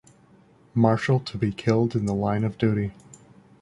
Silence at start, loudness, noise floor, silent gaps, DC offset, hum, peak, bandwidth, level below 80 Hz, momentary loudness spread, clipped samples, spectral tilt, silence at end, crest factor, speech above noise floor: 0.75 s; -24 LUFS; -56 dBFS; none; under 0.1%; none; -6 dBFS; 11 kHz; -52 dBFS; 7 LU; under 0.1%; -7.5 dB/octave; 0.7 s; 20 dB; 33 dB